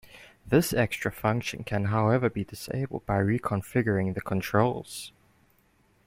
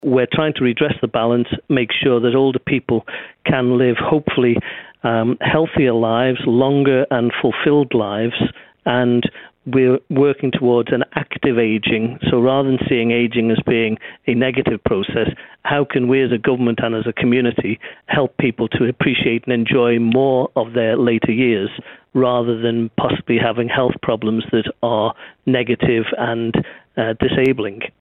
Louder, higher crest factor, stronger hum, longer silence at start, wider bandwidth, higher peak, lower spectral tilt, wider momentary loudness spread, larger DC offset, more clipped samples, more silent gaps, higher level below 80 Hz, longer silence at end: second, -28 LUFS vs -17 LUFS; about the same, 20 dB vs 16 dB; neither; about the same, 0.15 s vs 0.05 s; first, 16.5 kHz vs 4.2 kHz; second, -8 dBFS vs -2 dBFS; second, -6 dB/octave vs -9.5 dB/octave; first, 10 LU vs 6 LU; neither; neither; neither; about the same, -52 dBFS vs -48 dBFS; first, 1 s vs 0.1 s